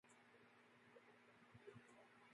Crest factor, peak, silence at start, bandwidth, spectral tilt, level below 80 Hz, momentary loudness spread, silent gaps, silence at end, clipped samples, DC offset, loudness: 20 dB; -48 dBFS; 0.05 s; 11 kHz; -5 dB/octave; under -90 dBFS; 5 LU; none; 0 s; under 0.1%; under 0.1%; -67 LUFS